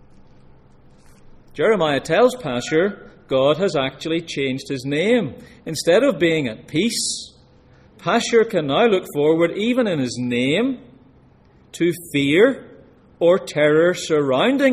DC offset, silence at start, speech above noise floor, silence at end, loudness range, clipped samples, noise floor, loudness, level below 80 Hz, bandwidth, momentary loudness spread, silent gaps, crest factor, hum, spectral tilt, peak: under 0.1%; 1.55 s; 33 dB; 0 s; 2 LU; under 0.1%; -51 dBFS; -19 LUFS; -54 dBFS; 15.5 kHz; 9 LU; none; 18 dB; none; -4.5 dB/octave; -2 dBFS